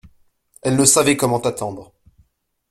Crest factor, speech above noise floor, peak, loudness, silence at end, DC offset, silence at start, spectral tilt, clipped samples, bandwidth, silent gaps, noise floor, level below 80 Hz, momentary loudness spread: 20 dB; 45 dB; 0 dBFS; -16 LUFS; 0.9 s; under 0.1%; 0.65 s; -3.5 dB/octave; under 0.1%; 16.5 kHz; none; -62 dBFS; -52 dBFS; 16 LU